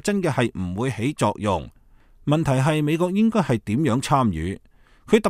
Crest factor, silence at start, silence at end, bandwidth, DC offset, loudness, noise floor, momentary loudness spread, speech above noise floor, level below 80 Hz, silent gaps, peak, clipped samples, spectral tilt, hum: 20 dB; 0.05 s; 0 s; 15 kHz; under 0.1%; -22 LUFS; -51 dBFS; 9 LU; 30 dB; -46 dBFS; none; -2 dBFS; under 0.1%; -6.5 dB/octave; none